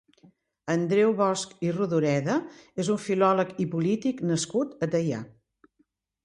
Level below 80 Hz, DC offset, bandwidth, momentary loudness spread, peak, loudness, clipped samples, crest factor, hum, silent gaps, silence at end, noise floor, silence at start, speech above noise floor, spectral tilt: -68 dBFS; under 0.1%; 11 kHz; 8 LU; -10 dBFS; -26 LUFS; under 0.1%; 18 dB; none; none; 0.95 s; -71 dBFS; 0.65 s; 45 dB; -6 dB/octave